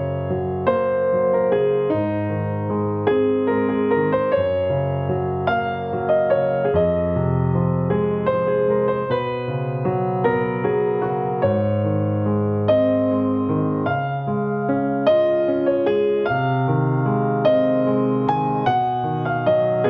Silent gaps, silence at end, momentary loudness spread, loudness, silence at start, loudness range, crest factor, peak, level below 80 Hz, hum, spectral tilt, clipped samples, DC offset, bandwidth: none; 0 s; 5 LU; -20 LUFS; 0 s; 2 LU; 14 dB; -6 dBFS; -52 dBFS; none; -10.5 dB/octave; under 0.1%; under 0.1%; 5.4 kHz